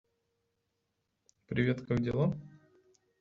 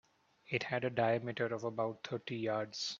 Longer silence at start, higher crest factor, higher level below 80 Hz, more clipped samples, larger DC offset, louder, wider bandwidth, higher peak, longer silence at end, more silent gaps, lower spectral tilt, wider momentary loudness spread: first, 1.5 s vs 0.5 s; about the same, 20 dB vs 20 dB; first, -62 dBFS vs -78 dBFS; neither; neither; first, -33 LUFS vs -37 LUFS; about the same, 7.4 kHz vs 7.6 kHz; about the same, -16 dBFS vs -18 dBFS; first, 0.7 s vs 0 s; neither; first, -7.5 dB/octave vs -5 dB/octave; about the same, 7 LU vs 6 LU